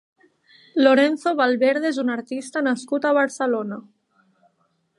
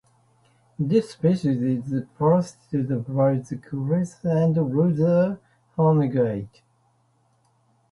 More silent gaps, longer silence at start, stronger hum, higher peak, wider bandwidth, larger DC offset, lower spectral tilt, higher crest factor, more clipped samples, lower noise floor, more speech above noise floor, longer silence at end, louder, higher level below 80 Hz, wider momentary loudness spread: neither; about the same, 0.75 s vs 0.8 s; neither; first, -4 dBFS vs -8 dBFS; about the same, 11.5 kHz vs 11 kHz; neither; second, -4 dB/octave vs -9 dB/octave; about the same, 18 dB vs 16 dB; neither; about the same, -68 dBFS vs -65 dBFS; first, 48 dB vs 43 dB; second, 1.2 s vs 1.45 s; about the same, -21 LUFS vs -23 LUFS; second, -80 dBFS vs -58 dBFS; about the same, 12 LU vs 10 LU